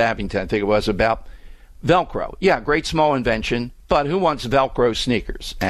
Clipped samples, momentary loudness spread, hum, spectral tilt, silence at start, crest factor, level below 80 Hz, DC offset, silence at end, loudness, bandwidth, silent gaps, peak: under 0.1%; 7 LU; none; -5.5 dB/octave; 0 s; 16 dB; -36 dBFS; under 0.1%; 0 s; -20 LUFS; 14 kHz; none; -4 dBFS